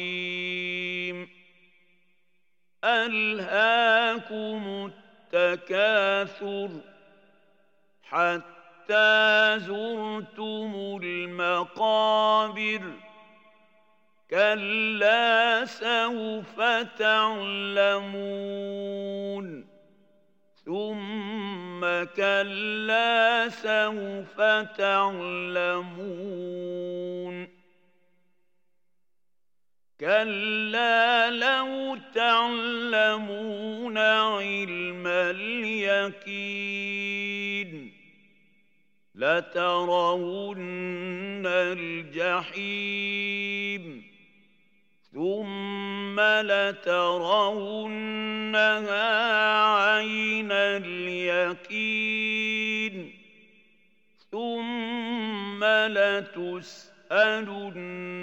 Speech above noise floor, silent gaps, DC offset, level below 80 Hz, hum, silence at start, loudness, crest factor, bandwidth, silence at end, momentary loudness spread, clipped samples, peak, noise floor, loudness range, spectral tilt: 63 dB; none; under 0.1%; under -90 dBFS; none; 0 s; -25 LUFS; 20 dB; 16 kHz; 0 s; 13 LU; under 0.1%; -8 dBFS; -89 dBFS; 7 LU; -4.5 dB/octave